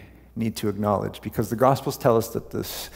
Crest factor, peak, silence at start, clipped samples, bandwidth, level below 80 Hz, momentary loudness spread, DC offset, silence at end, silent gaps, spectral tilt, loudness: 20 dB; -4 dBFS; 0 s; under 0.1%; 16.5 kHz; -50 dBFS; 9 LU; under 0.1%; 0 s; none; -6 dB/octave; -25 LUFS